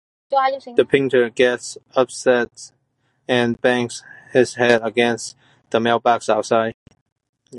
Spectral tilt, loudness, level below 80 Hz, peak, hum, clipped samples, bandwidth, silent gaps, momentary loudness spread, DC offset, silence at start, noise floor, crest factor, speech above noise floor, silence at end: -4.5 dB/octave; -19 LUFS; -62 dBFS; -2 dBFS; none; under 0.1%; 11.5 kHz; 6.74-6.86 s, 7.01-7.06 s, 7.12-7.16 s, 7.29-7.33 s; 11 LU; under 0.1%; 0.3 s; -67 dBFS; 18 dB; 49 dB; 0 s